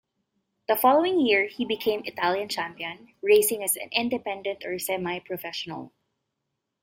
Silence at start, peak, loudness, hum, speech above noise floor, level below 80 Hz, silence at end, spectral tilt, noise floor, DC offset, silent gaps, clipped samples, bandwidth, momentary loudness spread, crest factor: 0.7 s; -8 dBFS; -25 LUFS; none; 56 dB; -68 dBFS; 0.95 s; -2.5 dB/octave; -82 dBFS; under 0.1%; none; under 0.1%; 16.5 kHz; 13 LU; 20 dB